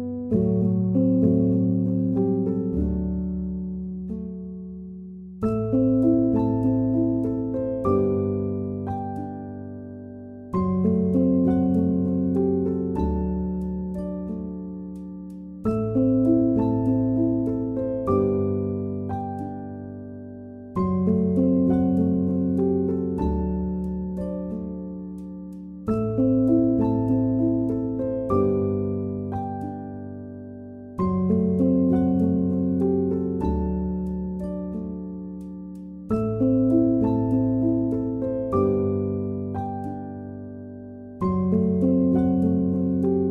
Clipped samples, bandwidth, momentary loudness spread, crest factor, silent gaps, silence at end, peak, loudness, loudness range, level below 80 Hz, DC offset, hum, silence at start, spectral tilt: under 0.1%; 2.8 kHz; 16 LU; 16 dB; none; 0 s; -8 dBFS; -24 LUFS; 5 LU; -42 dBFS; under 0.1%; none; 0 s; -12 dB/octave